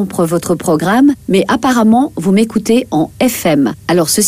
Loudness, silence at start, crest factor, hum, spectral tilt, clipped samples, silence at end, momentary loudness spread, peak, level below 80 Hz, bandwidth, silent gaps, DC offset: -12 LUFS; 0 s; 12 dB; none; -5 dB/octave; under 0.1%; 0 s; 4 LU; 0 dBFS; -44 dBFS; 16 kHz; none; under 0.1%